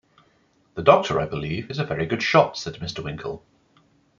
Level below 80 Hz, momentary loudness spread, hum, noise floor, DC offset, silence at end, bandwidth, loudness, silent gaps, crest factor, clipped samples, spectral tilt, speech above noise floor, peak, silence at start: -52 dBFS; 16 LU; none; -62 dBFS; under 0.1%; 0.8 s; 7.4 kHz; -22 LUFS; none; 22 dB; under 0.1%; -5.5 dB/octave; 40 dB; -2 dBFS; 0.75 s